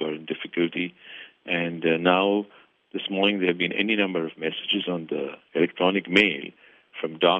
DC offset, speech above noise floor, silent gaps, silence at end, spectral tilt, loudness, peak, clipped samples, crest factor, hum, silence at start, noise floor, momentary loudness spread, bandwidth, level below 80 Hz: under 0.1%; 21 dB; none; 0 s; -6.5 dB/octave; -24 LUFS; -4 dBFS; under 0.1%; 22 dB; none; 0 s; -45 dBFS; 15 LU; 8.2 kHz; -72 dBFS